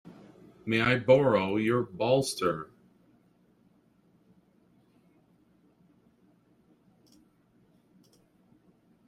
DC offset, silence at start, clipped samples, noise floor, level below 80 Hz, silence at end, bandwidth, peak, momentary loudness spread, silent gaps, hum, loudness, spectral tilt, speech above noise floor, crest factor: under 0.1%; 0.65 s; under 0.1%; -65 dBFS; -66 dBFS; 6.4 s; 14 kHz; -8 dBFS; 14 LU; none; none; -26 LUFS; -5.5 dB/octave; 40 dB; 24 dB